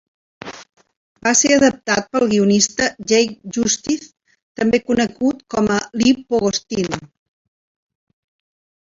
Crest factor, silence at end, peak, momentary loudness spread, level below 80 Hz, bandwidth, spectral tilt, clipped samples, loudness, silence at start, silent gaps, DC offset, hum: 18 dB; 1.75 s; -2 dBFS; 11 LU; -52 dBFS; 8 kHz; -3.5 dB/octave; under 0.1%; -17 LUFS; 0.45 s; 0.97-1.15 s, 4.42-4.55 s; under 0.1%; none